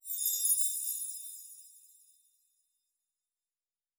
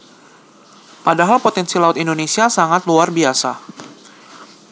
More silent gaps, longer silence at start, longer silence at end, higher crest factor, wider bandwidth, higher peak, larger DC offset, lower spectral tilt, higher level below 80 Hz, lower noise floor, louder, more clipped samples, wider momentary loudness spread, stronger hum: neither; second, 0.05 s vs 1.05 s; first, 2.1 s vs 0.25 s; about the same, 22 dB vs 18 dB; first, over 20 kHz vs 8 kHz; second, -16 dBFS vs 0 dBFS; neither; second, 10.5 dB/octave vs -3.5 dB/octave; second, under -90 dBFS vs -80 dBFS; first, under -90 dBFS vs -46 dBFS; second, -30 LUFS vs -15 LUFS; neither; first, 21 LU vs 10 LU; neither